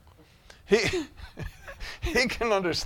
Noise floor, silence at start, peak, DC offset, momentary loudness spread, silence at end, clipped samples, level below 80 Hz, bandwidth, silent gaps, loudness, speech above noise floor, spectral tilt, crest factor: -55 dBFS; 0.7 s; -8 dBFS; under 0.1%; 17 LU; 0 s; under 0.1%; -44 dBFS; 17 kHz; none; -26 LUFS; 29 dB; -4 dB/octave; 20 dB